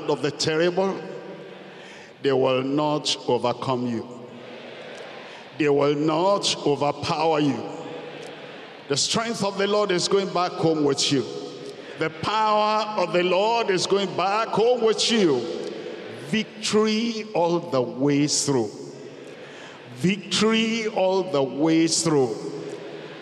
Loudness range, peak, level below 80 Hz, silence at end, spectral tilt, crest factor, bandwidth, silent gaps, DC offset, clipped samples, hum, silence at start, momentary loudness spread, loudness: 3 LU; -10 dBFS; -70 dBFS; 0 s; -4 dB/octave; 12 dB; 12.5 kHz; none; under 0.1%; under 0.1%; none; 0 s; 19 LU; -23 LUFS